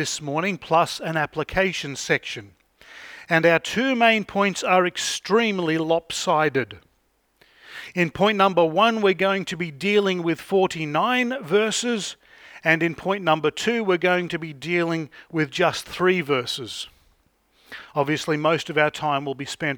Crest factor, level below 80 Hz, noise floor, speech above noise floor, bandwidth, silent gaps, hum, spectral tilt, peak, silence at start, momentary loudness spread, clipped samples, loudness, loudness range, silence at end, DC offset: 20 dB; -58 dBFS; -67 dBFS; 44 dB; 19.5 kHz; none; none; -4 dB/octave; -2 dBFS; 0 s; 11 LU; under 0.1%; -22 LUFS; 4 LU; 0 s; under 0.1%